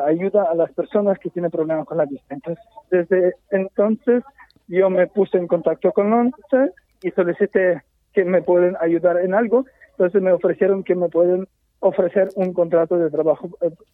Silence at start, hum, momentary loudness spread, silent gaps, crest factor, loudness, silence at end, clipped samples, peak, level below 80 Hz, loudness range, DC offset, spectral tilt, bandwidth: 0 s; none; 7 LU; none; 14 dB; -19 LUFS; 0.2 s; under 0.1%; -4 dBFS; -64 dBFS; 3 LU; under 0.1%; -10.5 dB/octave; 3.9 kHz